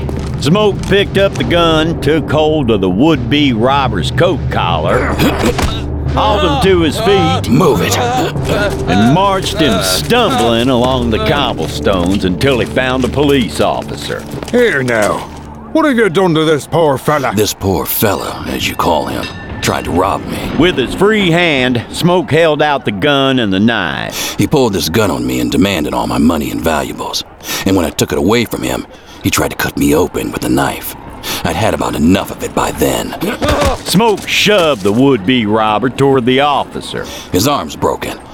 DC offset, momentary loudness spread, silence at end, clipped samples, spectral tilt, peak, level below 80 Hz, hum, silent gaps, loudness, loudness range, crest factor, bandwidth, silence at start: 0.4%; 8 LU; 0 s; under 0.1%; -5 dB/octave; 0 dBFS; -28 dBFS; none; none; -13 LUFS; 3 LU; 12 dB; over 20 kHz; 0 s